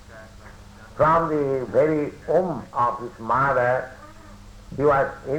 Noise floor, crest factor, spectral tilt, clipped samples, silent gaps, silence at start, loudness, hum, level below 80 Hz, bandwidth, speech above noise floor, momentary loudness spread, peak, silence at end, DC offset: -44 dBFS; 16 dB; -7.5 dB/octave; under 0.1%; none; 0.1 s; -22 LUFS; none; -48 dBFS; over 20 kHz; 22 dB; 9 LU; -8 dBFS; 0 s; under 0.1%